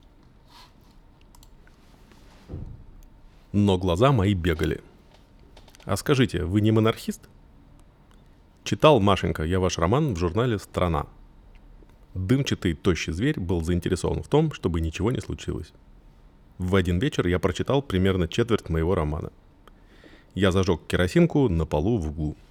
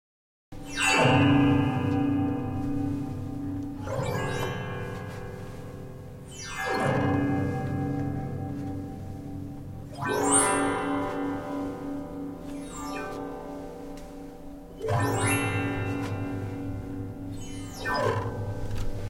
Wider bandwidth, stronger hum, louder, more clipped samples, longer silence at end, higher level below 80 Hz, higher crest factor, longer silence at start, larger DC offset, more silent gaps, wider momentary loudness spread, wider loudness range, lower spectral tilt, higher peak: about the same, 16 kHz vs 16.5 kHz; neither; first, -24 LUFS vs -29 LUFS; neither; first, 0.15 s vs 0 s; about the same, -40 dBFS vs -44 dBFS; about the same, 24 dB vs 20 dB; about the same, 0.55 s vs 0.5 s; neither; neither; second, 14 LU vs 18 LU; second, 4 LU vs 9 LU; first, -6.5 dB/octave vs -5 dB/octave; first, -2 dBFS vs -8 dBFS